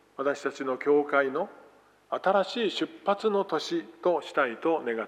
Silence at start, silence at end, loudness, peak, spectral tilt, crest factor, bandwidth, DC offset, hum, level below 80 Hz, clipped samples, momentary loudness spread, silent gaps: 0.2 s; 0 s; -28 LUFS; -10 dBFS; -4.5 dB/octave; 20 dB; 10.5 kHz; under 0.1%; 50 Hz at -75 dBFS; -82 dBFS; under 0.1%; 6 LU; none